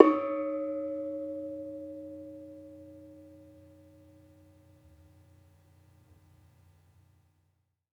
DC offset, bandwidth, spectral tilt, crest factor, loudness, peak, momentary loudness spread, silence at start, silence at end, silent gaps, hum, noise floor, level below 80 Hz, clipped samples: under 0.1%; 5.6 kHz; -8 dB/octave; 34 dB; -34 LUFS; -2 dBFS; 24 LU; 0 s; 4.65 s; none; none; -76 dBFS; -76 dBFS; under 0.1%